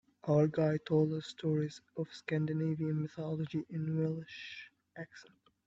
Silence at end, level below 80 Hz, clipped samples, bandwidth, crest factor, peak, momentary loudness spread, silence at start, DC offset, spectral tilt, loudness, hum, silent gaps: 0.45 s; -74 dBFS; under 0.1%; 7.6 kHz; 18 dB; -18 dBFS; 18 LU; 0.25 s; under 0.1%; -8 dB/octave; -35 LUFS; none; none